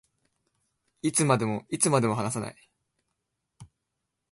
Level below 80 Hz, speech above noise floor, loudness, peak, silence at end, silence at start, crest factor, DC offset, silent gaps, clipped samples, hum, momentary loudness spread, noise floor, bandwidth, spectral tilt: -66 dBFS; 57 dB; -26 LUFS; -6 dBFS; 0.65 s; 1.05 s; 24 dB; under 0.1%; none; under 0.1%; none; 10 LU; -83 dBFS; 12 kHz; -4.5 dB/octave